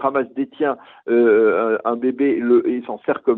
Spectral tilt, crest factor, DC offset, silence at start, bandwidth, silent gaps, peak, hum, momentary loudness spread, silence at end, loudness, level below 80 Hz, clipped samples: -9.5 dB/octave; 14 dB; under 0.1%; 0 s; 4 kHz; none; -4 dBFS; none; 9 LU; 0 s; -18 LUFS; -68 dBFS; under 0.1%